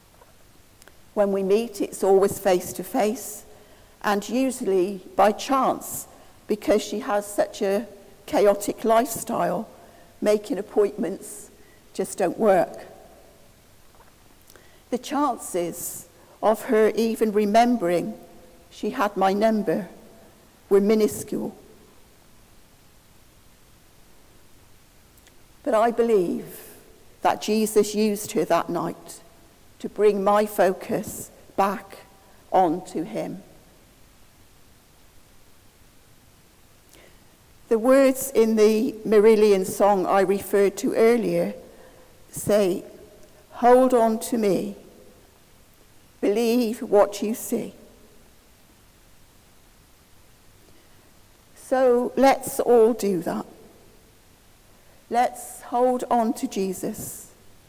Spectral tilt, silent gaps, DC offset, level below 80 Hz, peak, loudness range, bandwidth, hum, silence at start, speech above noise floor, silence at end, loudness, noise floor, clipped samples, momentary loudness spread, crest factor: -5 dB/octave; none; under 0.1%; -58 dBFS; -6 dBFS; 8 LU; 16 kHz; none; 1.15 s; 32 dB; 0.45 s; -22 LUFS; -54 dBFS; under 0.1%; 15 LU; 20 dB